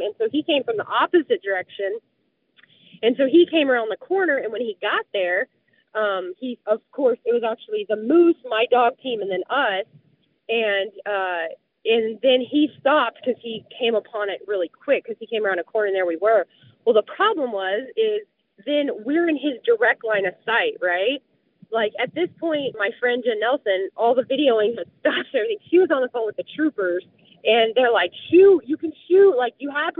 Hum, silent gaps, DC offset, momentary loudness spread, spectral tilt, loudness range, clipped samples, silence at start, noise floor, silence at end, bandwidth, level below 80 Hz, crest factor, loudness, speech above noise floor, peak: none; none; under 0.1%; 11 LU; -1 dB/octave; 4 LU; under 0.1%; 0 s; -62 dBFS; 0.1 s; 4.2 kHz; -76 dBFS; 16 dB; -21 LUFS; 41 dB; -6 dBFS